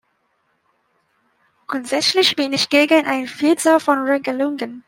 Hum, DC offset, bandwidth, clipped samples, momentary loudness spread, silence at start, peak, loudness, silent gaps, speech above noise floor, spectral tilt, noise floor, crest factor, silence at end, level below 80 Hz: none; under 0.1%; 16.5 kHz; under 0.1%; 8 LU; 1.7 s; -2 dBFS; -17 LUFS; none; 49 dB; -2.5 dB/octave; -66 dBFS; 18 dB; 0.1 s; -68 dBFS